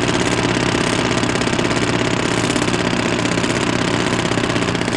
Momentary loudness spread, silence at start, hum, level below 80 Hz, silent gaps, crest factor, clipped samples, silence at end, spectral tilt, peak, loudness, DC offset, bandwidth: 1 LU; 0 s; none; -38 dBFS; none; 14 dB; under 0.1%; 0 s; -4.5 dB/octave; -4 dBFS; -17 LUFS; 0.2%; 12.5 kHz